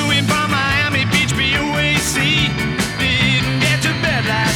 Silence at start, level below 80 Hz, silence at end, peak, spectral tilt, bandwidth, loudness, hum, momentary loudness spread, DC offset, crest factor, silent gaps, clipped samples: 0 s; -34 dBFS; 0 s; -4 dBFS; -3.5 dB/octave; 18 kHz; -15 LUFS; none; 3 LU; under 0.1%; 12 dB; none; under 0.1%